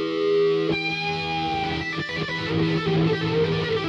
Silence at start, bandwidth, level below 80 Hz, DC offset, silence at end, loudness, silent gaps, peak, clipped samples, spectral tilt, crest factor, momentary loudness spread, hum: 0 s; 7.6 kHz; -52 dBFS; under 0.1%; 0 s; -23 LUFS; none; -12 dBFS; under 0.1%; -6.5 dB/octave; 12 dB; 5 LU; none